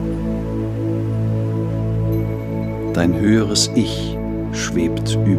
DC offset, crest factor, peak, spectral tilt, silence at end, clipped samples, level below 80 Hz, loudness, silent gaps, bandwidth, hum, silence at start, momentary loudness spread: under 0.1%; 16 dB; -4 dBFS; -5.5 dB/octave; 0 s; under 0.1%; -34 dBFS; -20 LUFS; none; 14 kHz; none; 0 s; 8 LU